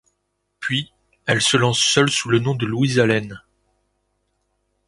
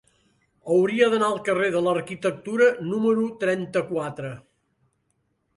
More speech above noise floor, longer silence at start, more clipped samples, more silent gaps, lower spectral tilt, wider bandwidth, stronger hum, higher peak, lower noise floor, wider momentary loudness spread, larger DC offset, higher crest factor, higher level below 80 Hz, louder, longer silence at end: first, 54 dB vs 49 dB; about the same, 0.6 s vs 0.65 s; neither; neither; second, -4 dB/octave vs -6 dB/octave; about the same, 11.5 kHz vs 11.5 kHz; neither; first, -2 dBFS vs -6 dBFS; about the same, -73 dBFS vs -72 dBFS; about the same, 14 LU vs 12 LU; neither; about the same, 20 dB vs 18 dB; first, -56 dBFS vs -68 dBFS; first, -18 LUFS vs -23 LUFS; first, 1.5 s vs 1.2 s